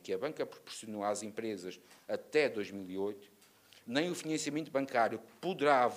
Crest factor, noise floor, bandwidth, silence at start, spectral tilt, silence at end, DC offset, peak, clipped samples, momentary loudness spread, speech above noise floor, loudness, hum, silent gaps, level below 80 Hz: 22 dB; -62 dBFS; 15.5 kHz; 0.05 s; -4 dB/octave; 0 s; under 0.1%; -14 dBFS; under 0.1%; 12 LU; 27 dB; -36 LUFS; none; none; -84 dBFS